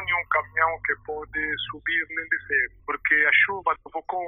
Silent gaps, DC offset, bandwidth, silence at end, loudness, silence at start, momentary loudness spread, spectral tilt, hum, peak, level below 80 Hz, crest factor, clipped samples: none; under 0.1%; 4 kHz; 0 s; -24 LUFS; 0 s; 11 LU; -7 dB/octave; none; -6 dBFS; -54 dBFS; 20 dB; under 0.1%